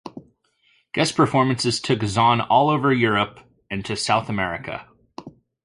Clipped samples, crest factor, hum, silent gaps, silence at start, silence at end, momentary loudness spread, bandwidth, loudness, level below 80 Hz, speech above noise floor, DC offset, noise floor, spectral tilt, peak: under 0.1%; 18 dB; none; none; 0.05 s; 0.35 s; 17 LU; 11.5 kHz; -20 LUFS; -52 dBFS; 43 dB; under 0.1%; -63 dBFS; -5 dB/octave; -4 dBFS